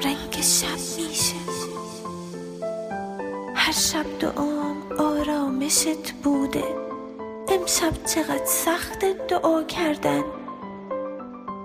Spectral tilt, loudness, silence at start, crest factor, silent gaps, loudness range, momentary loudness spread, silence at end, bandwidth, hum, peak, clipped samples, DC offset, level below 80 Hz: -2.5 dB/octave; -24 LUFS; 0 s; 18 dB; none; 3 LU; 14 LU; 0 s; 15.5 kHz; none; -6 dBFS; under 0.1%; under 0.1%; -50 dBFS